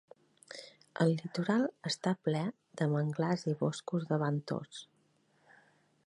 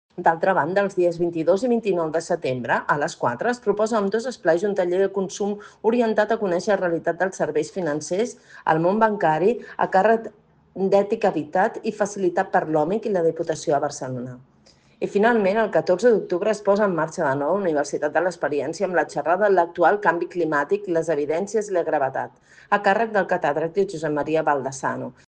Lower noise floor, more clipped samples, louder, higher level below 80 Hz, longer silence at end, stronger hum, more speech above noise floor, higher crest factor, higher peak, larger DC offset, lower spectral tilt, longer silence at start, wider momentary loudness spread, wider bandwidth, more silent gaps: first, -72 dBFS vs -56 dBFS; neither; second, -34 LUFS vs -22 LUFS; second, -80 dBFS vs -64 dBFS; first, 1.25 s vs 0.15 s; neither; first, 39 dB vs 34 dB; about the same, 20 dB vs 18 dB; second, -14 dBFS vs -4 dBFS; neither; about the same, -6.5 dB/octave vs -5.5 dB/octave; first, 0.5 s vs 0.15 s; first, 17 LU vs 7 LU; first, 11 kHz vs 9.8 kHz; neither